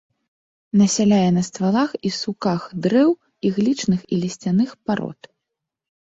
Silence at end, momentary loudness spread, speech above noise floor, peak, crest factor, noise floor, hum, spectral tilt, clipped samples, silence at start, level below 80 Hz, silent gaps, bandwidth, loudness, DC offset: 1 s; 8 LU; 63 dB; -6 dBFS; 14 dB; -82 dBFS; none; -6 dB/octave; under 0.1%; 0.75 s; -58 dBFS; none; 8 kHz; -20 LUFS; under 0.1%